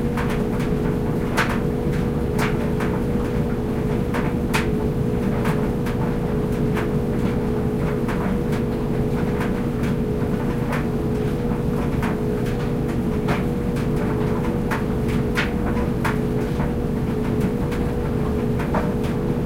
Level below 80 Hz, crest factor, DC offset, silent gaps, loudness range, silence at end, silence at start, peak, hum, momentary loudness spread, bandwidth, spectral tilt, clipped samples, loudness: -30 dBFS; 16 dB; under 0.1%; none; 1 LU; 0 s; 0 s; -6 dBFS; none; 2 LU; 16 kHz; -7.5 dB/octave; under 0.1%; -22 LUFS